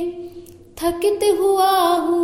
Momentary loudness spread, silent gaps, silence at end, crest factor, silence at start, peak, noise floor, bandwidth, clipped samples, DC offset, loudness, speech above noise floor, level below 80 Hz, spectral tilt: 15 LU; none; 0 s; 12 dB; 0 s; -6 dBFS; -40 dBFS; 16.5 kHz; under 0.1%; under 0.1%; -18 LUFS; 23 dB; -50 dBFS; -3.5 dB/octave